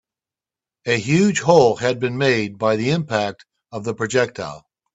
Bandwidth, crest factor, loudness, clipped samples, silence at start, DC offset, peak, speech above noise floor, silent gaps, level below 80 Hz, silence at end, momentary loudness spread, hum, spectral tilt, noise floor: 8.2 kHz; 20 dB; -19 LUFS; under 0.1%; 0.85 s; under 0.1%; 0 dBFS; 71 dB; none; -58 dBFS; 0.35 s; 16 LU; none; -5 dB/octave; -90 dBFS